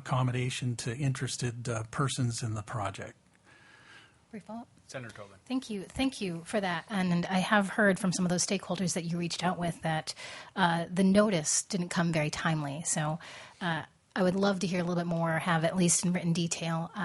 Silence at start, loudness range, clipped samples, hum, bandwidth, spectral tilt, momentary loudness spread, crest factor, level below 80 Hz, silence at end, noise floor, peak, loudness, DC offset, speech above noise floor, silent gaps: 0 s; 9 LU; under 0.1%; none; 11.5 kHz; -4.5 dB/octave; 14 LU; 22 dB; -62 dBFS; 0 s; -60 dBFS; -10 dBFS; -30 LUFS; under 0.1%; 29 dB; none